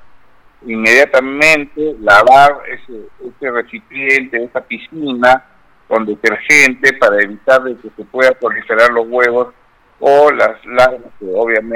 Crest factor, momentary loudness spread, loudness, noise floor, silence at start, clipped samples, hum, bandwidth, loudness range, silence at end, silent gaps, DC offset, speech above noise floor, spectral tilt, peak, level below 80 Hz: 12 dB; 17 LU; -11 LUFS; -46 dBFS; 0.65 s; 0.3%; none; 17.5 kHz; 5 LU; 0 s; none; under 0.1%; 34 dB; -3 dB/octave; 0 dBFS; -48 dBFS